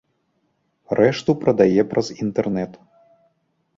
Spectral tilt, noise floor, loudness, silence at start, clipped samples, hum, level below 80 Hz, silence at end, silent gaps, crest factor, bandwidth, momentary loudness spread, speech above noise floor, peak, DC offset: -7 dB/octave; -69 dBFS; -20 LUFS; 0.9 s; under 0.1%; none; -56 dBFS; 1 s; none; 20 dB; 7.8 kHz; 9 LU; 50 dB; -2 dBFS; under 0.1%